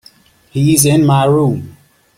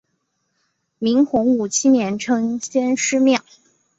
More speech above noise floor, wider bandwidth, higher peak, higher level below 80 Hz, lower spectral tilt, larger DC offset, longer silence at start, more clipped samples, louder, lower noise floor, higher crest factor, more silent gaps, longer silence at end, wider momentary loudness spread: second, 36 dB vs 53 dB; first, 16.5 kHz vs 8 kHz; first, 0 dBFS vs -4 dBFS; first, -46 dBFS vs -60 dBFS; first, -5.5 dB/octave vs -3.5 dB/octave; neither; second, 0.55 s vs 1 s; neither; first, -12 LUFS vs -18 LUFS; second, -47 dBFS vs -71 dBFS; about the same, 14 dB vs 14 dB; neither; about the same, 0.5 s vs 0.6 s; first, 12 LU vs 5 LU